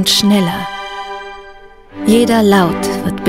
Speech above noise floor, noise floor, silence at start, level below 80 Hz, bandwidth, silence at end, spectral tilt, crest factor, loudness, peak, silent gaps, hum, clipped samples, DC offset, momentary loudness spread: 25 dB; -37 dBFS; 0 s; -42 dBFS; 16.5 kHz; 0 s; -4.5 dB/octave; 14 dB; -13 LUFS; 0 dBFS; none; none; under 0.1%; under 0.1%; 17 LU